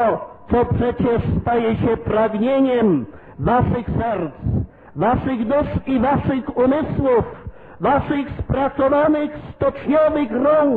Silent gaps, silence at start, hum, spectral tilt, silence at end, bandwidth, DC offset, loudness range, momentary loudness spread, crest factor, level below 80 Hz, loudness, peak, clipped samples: none; 0 s; none; -10.5 dB/octave; 0 s; 4.5 kHz; under 0.1%; 2 LU; 7 LU; 12 dB; -38 dBFS; -19 LUFS; -6 dBFS; under 0.1%